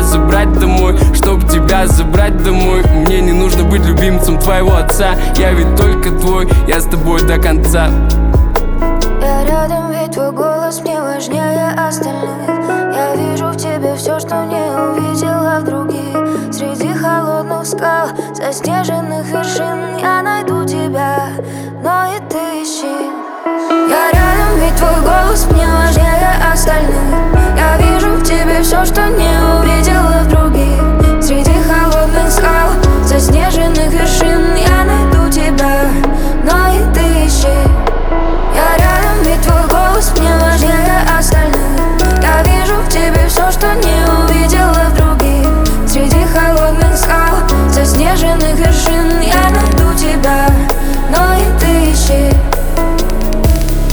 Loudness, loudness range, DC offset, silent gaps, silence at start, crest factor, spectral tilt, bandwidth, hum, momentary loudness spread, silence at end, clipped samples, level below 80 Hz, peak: -12 LUFS; 5 LU; under 0.1%; none; 0 s; 10 dB; -5 dB/octave; over 20 kHz; none; 7 LU; 0 s; under 0.1%; -12 dBFS; 0 dBFS